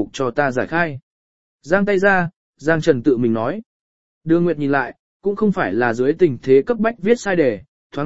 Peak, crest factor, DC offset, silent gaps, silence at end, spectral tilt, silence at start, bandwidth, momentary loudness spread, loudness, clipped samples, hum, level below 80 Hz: 0 dBFS; 18 dB; 1%; 1.03-1.59 s, 2.36-2.53 s, 3.66-4.21 s, 4.99-5.20 s, 7.68-7.90 s; 0 s; -7 dB/octave; 0 s; 8 kHz; 11 LU; -18 LUFS; under 0.1%; none; -52 dBFS